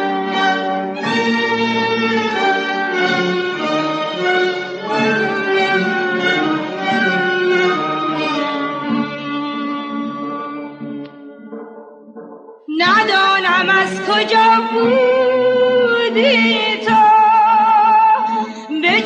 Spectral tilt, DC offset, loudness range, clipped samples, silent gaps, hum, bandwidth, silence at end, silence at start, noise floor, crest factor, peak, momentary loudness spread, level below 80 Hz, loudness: -4.5 dB/octave; under 0.1%; 10 LU; under 0.1%; none; none; 9.4 kHz; 0 s; 0 s; -37 dBFS; 14 dB; -2 dBFS; 12 LU; -66 dBFS; -15 LUFS